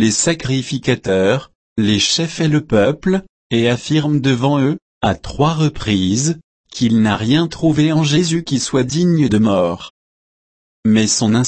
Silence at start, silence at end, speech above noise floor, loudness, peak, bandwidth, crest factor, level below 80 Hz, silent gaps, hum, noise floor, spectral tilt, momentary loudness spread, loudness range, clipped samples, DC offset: 0 s; 0 s; over 75 dB; -16 LUFS; -2 dBFS; 8.8 kHz; 14 dB; -42 dBFS; 1.55-1.76 s, 3.29-3.50 s, 4.82-5.01 s, 6.44-6.64 s, 9.90-10.83 s; none; under -90 dBFS; -5 dB/octave; 6 LU; 2 LU; under 0.1%; under 0.1%